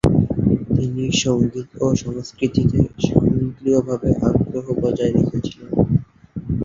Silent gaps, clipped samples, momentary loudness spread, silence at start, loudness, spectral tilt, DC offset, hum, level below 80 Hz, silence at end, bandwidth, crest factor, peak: none; under 0.1%; 6 LU; 0.05 s; -20 LUFS; -7 dB/octave; under 0.1%; none; -36 dBFS; 0 s; 9.2 kHz; 18 dB; 0 dBFS